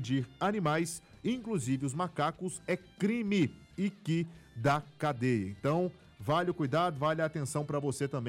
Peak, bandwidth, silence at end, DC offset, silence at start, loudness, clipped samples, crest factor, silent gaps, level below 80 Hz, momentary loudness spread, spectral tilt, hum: -18 dBFS; 16 kHz; 0 s; under 0.1%; 0 s; -33 LUFS; under 0.1%; 14 dB; none; -64 dBFS; 6 LU; -6 dB/octave; none